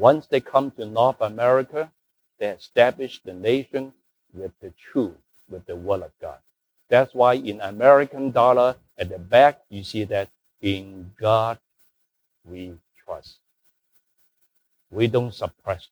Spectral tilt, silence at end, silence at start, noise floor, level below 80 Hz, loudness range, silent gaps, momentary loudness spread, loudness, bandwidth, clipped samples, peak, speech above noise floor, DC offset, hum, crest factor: -6.5 dB/octave; 0.15 s; 0 s; -73 dBFS; -60 dBFS; 11 LU; none; 21 LU; -22 LUFS; over 20 kHz; under 0.1%; -2 dBFS; 52 dB; under 0.1%; none; 22 dB